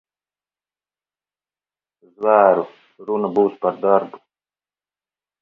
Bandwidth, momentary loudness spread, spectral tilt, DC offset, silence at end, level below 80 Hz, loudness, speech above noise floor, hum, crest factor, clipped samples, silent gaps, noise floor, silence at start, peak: 4.5 kHz; 18 LU; -9 dB/octave; under 0.1%; 1.25 s; -72 dBFS; -18 LUFS; over 73 dB; 50 Hz at -55 dBFS; 22 dB; under 0.1%; none; under -90 dBFS; 2.2 s; 0 dBFS